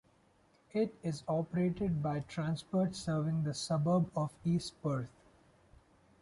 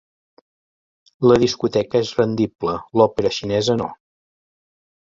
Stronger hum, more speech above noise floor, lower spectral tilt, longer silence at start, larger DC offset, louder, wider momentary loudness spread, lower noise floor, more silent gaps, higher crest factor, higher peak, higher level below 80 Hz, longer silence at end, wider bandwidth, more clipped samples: neither; second, 34 dB vs over 72 dB; about the same, -7 dB/octave vs -6 dB/octave; second, 0.75 s vs 1.2 s; neither; second, -35 LUFS vs -19 LUFS; about the same, 6 LU vs 7 LU; second, -68 dBFS vs under -90 dBFS; second, none vs 2.55-2.59 s; second, 14 dB vs 20 dB; second, -22 dBFS vs -2 dBFS; second, -62 dBFS vs -52 dBFS; about the same, 1.15 s vs 1.1 s; first, 11.5 kHz vs 7.8 kHz; neither